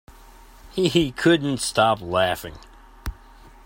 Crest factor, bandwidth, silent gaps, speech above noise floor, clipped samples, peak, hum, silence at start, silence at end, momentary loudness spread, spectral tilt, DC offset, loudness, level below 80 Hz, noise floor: 20 dB; 16.5 kHz; none; 26 dB; under 0.1%; -4 dBFS; none; 0.65 s; 0.15 s; 18 LU; -4.5 dB/octave; under 0.1%; -21 LUFS; -44 dBFS; -47 dBFS